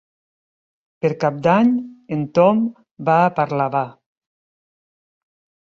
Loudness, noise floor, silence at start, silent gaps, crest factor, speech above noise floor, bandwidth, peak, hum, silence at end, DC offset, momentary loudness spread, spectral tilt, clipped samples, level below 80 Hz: -19 LUFS; under -90 dBFS; 1.05 s; 2.91-2.95 s; 18 dB; over 73 dB; 7.2 kHz; -2 dBFS; none; 1.85 s; under 0.1%; 11 LU; -8.5 dB/octave; under 0.1%; -64 dBFS